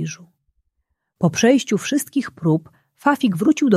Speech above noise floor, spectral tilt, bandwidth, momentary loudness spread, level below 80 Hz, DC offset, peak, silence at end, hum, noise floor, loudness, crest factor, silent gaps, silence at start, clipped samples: 56 dB; -5.5 dB/octave; 15 kHz; 8 LU; -62 dBFS; under 0.1%; -2 dBFS; 0 s; none; -74 dBFS; -19 LUFS; 18 dB; none; 0 s; under 0.1%